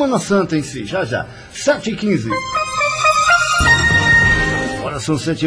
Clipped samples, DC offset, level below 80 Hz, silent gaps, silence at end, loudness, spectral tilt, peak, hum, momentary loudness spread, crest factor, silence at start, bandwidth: under 0.1%; under 0.1%; -32 dBFS; none; 0 s; -15 LUFS; -4 dB/octave; -2 dBFS; none; 11 LU; 14 dB; 0 s; 10.5 kHz